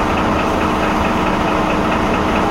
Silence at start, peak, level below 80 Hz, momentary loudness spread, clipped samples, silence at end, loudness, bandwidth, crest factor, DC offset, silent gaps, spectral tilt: 0 s; -4 dBFS; -28 dBFS; 0 LU; under 0.1%; 0 s; -16 LUFS; 16 kHz; 12 dB; under 0.1%; none; -5.5 dB/octave